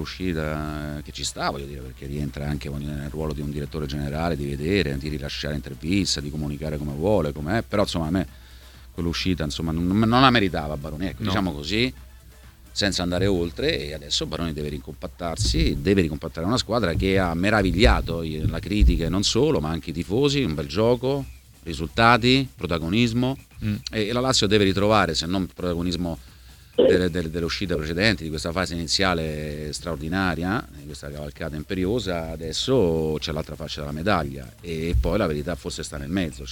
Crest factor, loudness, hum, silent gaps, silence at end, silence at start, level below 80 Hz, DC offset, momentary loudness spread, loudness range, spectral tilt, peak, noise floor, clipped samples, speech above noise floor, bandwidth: 22 dB; -24 LUFS; none; none; 0 s; 0 s; -34 dBFS; under 0.1%; 12 LU; 6 LU; -5 dB/octave; -2 dBFS; -47 dBFS; under 0.1%; 24 dB; 18.5 kHz